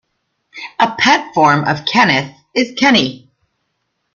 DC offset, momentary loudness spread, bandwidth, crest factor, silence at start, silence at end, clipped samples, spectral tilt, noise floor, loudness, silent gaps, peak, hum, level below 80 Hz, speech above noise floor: under 0.1%; 10 LU; 7.4 kHz; 16 dB; 0.55 s; 0.95 s; under 0.1%; -4 dB/octave; -69 dBFS; -13 LUFS; none; 0 dBFS; none; -56 dBFS; 56 dB